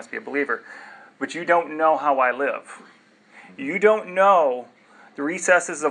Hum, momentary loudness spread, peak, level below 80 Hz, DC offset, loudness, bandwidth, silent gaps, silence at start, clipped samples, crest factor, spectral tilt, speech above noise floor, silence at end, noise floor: none; 15 LU; -2 dBFS; -88 dBFS; under 0.1%; -21 LUFS; 11 kHz; none; 0 s; under 0.1%; 20 dB; -3.5 dB/octave; 29 dB; 0 s; -50 dBFS